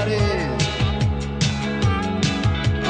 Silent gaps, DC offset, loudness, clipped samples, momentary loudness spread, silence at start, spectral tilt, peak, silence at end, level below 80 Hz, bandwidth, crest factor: none; under 0.1%; -21 LUFS; under 0.1%; 2 LU; 0 s; -5.5 dB/octave; -8 dBFS; 0 s; -30 dBFS; 9.8 kHz; 12 dB